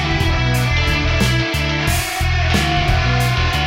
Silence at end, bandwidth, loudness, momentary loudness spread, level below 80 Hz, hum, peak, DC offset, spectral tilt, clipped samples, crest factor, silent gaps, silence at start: 0 s; 16.5 kHz; -17 LUFS; 2 LU; -22 dBFS; none; -2 dBFS; under 0.1%; -4.5 dB/octave; under 0.1%; 14 dB; none; 0 s